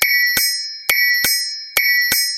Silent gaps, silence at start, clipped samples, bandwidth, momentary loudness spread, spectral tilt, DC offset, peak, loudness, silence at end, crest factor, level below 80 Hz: none; 0 s; under 0.1%; 18.5 kHz; 5 LU; 2 dB/octave; under 0.1%; 0 dBFS; -15 LUFS; 0 s; 18 dB; -54 dBFS